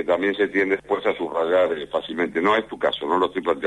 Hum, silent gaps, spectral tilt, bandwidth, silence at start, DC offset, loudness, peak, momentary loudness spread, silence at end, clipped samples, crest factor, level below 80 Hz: none; none; -5.5 dB/octave; 9.8 kHz; 0 s; under 0.1%; -22 LUFS; -8 dBFS; 5 LU; 0 s; under 0.1%; 14 dB; -58 dBFS